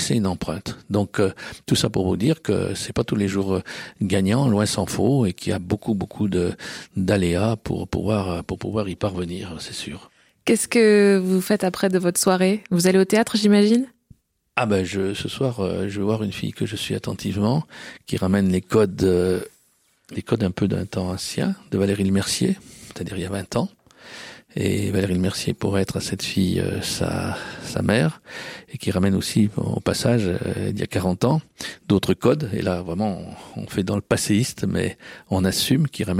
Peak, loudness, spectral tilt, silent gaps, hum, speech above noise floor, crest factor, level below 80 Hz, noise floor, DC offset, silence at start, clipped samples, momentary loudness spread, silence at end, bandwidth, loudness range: -2 dBFS; -22 LUFS; -5.5 dB/octave; none; none; 41 dB; 20 dB; -48 dBFS; -62 dBFS; under 0.1%; 0 s; under 0.1%; 12 LU; 0 s; 16.5 kHz; 5 LU